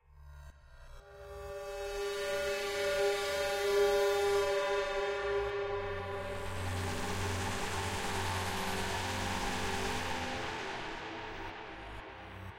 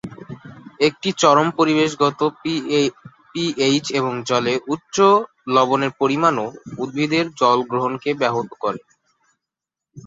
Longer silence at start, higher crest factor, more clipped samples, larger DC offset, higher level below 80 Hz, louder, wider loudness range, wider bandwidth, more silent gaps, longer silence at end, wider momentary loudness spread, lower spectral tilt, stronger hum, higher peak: about the same, 0.1 s vs 0.05 s; about the same, 16 dB vs 18 dB; neither; neither; first, -50 dBFS vs -62 dBFS; second, -35 LUFS vs -19 LUFS; about the same, 5 LU vs 3 LU; first, 16 kHz vs 7.8 kHz; neither; about the same, 0 s vs 0.05 s; first, 15 LU vs 12 LU; about the same, -3.5 dB/octave vs -4.5 dB/octave; neither; second, -20 dBFS vs -2 dBFS